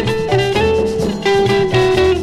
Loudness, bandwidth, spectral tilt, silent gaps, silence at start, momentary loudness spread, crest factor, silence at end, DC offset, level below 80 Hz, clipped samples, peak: -14 LUFS; 13.5 kHz; -6 dB/octave; none; 0 s; 3 LU; 12 dB; 0 s; under 0.1%; -32 dBFS; under 0.1%; -2 dBFS